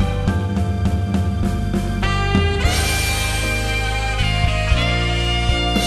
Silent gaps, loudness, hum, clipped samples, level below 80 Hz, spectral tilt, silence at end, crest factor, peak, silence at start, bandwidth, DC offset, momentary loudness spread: none; -19 LUFS; none; under 0.1%; -22 dBFS; -4.5 dB/octave; 0 s; 16 dB; -2 dBFS; 0 s; 13.5 kHz; under 0.1%; 3 LU